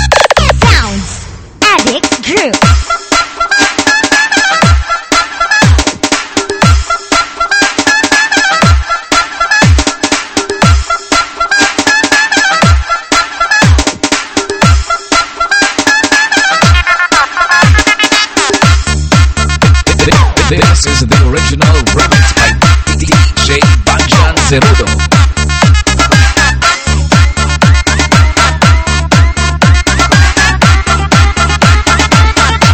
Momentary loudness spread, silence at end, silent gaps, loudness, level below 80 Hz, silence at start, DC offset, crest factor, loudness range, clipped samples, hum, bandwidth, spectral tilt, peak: 4 LU; 0 s; none; -8 LUFS; -14 dBFS; 0 s; under 0.1%; 8 dB; 2 LU; 2%; none; 13.5 kHz; -4 dB/octave; 0 dBFS